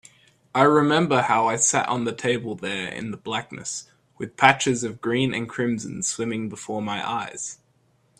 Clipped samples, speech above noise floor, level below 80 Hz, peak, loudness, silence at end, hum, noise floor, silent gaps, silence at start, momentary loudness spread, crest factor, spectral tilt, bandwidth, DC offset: under 0.1%; 40 dB; -64 dBFS; 0 dBFS; -23 LUFS; 0.65 s; none; -64 dBFS; none; 0.55 s; 14 LU; 24 dB; -3.5 dB/octave; 13.5 kHz; under 0.1%